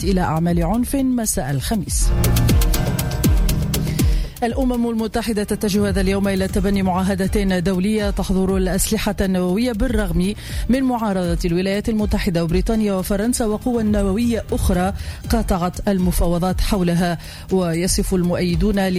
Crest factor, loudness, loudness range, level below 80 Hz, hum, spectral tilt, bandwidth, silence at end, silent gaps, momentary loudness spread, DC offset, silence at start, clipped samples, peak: 12 dB; -19 LUFS; 1 LU; -24 dBFS; none; -5.5 dB/octave; 16 kHz; 0 s; none; 3 LU; under 0.1%; 0 s; under 0.1%; -6 dBFS